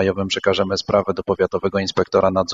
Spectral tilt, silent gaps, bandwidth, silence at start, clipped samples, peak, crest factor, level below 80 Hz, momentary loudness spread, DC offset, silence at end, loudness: -5 dB/octave; none; 7.6 kHz; 0 s; under 0.1%; -2 dBFS; 18 dB; -48 dBFS; 3 LU; under 0.1%; 0 s; -19 LUFS